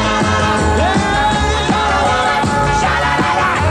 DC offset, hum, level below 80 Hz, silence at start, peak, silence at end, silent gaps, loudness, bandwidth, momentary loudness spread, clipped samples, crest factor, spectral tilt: under 0.1%; none; -26 dBFS; 0 s; -2 dBFS; 0 s; none; -14 LUFS; 12.5 kHz; 1 LU; under 0.1%; 12 dB; -4.5 dB/octave